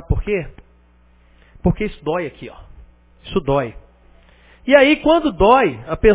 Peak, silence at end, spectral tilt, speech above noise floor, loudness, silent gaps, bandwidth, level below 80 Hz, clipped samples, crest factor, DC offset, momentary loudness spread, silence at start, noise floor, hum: 0 dBFS; 0 s; -10 dB/octave; 36 dB; -17 LUFS; none; 4 kHz; -32 dBFS; under 0.1%; 18 dB; under 0.1%; 18 LU; 0.1 s; -52 dBFS; 60 Hz at -45 dBFS